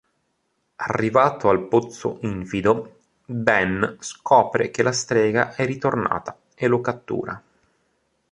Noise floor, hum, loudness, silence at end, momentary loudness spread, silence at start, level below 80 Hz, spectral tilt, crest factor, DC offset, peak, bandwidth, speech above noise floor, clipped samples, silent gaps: -72 dBFS; none; -21 LUFS; 0.9 s; 12 LU; 0.8 s; -54 dBFS; -5.5 dB/octave; 22 dB; under 0.1%; 0 dBFS; 11 kHz; 51 dB; under 0.1%; none